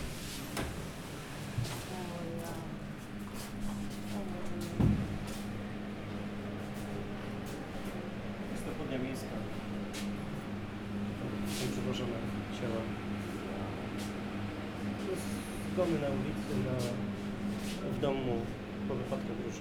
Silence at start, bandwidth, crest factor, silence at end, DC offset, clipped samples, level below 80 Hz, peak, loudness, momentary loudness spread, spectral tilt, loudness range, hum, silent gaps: 0 s; 19.5 kHz; 20 dB; 0 s; under 0.1%; under 0.1%; -50 dBFS; -16 dBFS; -38 LUFS; 7 LU; -6 dB/octave; 5 LU; none; none